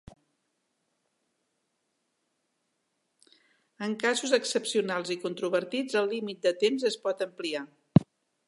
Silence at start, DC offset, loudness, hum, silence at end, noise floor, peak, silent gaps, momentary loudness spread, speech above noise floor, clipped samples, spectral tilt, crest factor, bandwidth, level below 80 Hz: 3.8 s; under 0.1%; -29 LUFS; none; 0.45 s; -78 dBFS; -4 dBFS; none; 8 LU; 49 dB; under 0.1%; -5 dB/octave; 28 dB; 11.5 kHz; -64 dBFS